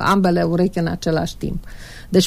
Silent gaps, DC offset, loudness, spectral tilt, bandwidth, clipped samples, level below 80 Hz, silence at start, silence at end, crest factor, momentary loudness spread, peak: none; under 0.1%; -20 LUFS; -6 dB/octave; 15 kHz; under 0.1%; -36 dBFS; 0 s; 0 s; 16 dB; 17 LU; -2 dBFS